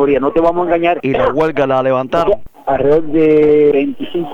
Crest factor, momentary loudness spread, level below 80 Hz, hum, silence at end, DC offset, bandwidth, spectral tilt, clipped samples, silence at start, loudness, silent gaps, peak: 12 dB; 7 LU; -38 dBFS; none; 0 s; under 0.1%; 6.8 kHz; -8 dB/octave; under 0.1%; 0 s; -13 LUFS; none; 0 dBFS